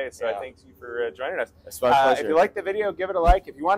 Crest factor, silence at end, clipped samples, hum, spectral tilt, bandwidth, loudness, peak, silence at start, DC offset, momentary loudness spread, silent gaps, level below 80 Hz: 20 dB; 0 s; under 0.1%; none; -5 dB/octave; 16 kHz; -23 LUFS; -4 dBFS; 0 s; under 0.1%; 14 LU; none; -32 dBFS